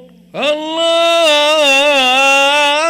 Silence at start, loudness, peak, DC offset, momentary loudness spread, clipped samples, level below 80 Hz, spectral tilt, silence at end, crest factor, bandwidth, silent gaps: 0.35 s; -10 LUFS; -4 dBFS; under 0.1%; 8 LU; under 0.1%; -56 dBFS; -0.5 dB/octave; 0 s; 8 dB; 16.5 kHz; none